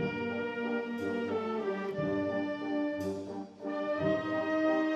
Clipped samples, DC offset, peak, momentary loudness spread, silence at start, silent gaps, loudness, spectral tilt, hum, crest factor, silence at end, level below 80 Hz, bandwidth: under 0.1%; under 0.1%; -18 dBFS; 6 LU; 0 s; none; -34 LUFS; -7 dB/octave; none; 14 dB; 0 s; -68 dBFS; 12.5 kHz